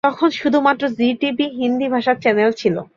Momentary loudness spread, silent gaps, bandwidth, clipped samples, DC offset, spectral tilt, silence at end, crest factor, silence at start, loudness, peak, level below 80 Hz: 4 LU; none; 7.2 kHz; under 0.1%; under 0.1%; -6 dB/octave; 0.1 s; 16 dB; 0.05 s; -18 LUFS; -2 dBFS; -62 dBFS